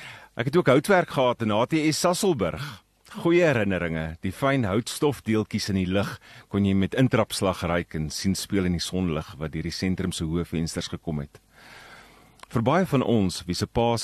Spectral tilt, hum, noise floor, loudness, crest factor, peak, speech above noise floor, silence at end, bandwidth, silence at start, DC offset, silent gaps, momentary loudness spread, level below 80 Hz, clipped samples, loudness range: -5.5 dB/octave; none; -51 dBFS; -25 LUFS; 20 dB; -6 dBFS; 27 dB; 0 s; 13 kHz; 0 s; under 0.1%; none; 11 LU; -48 dBFS; under 0.1%; 5 LU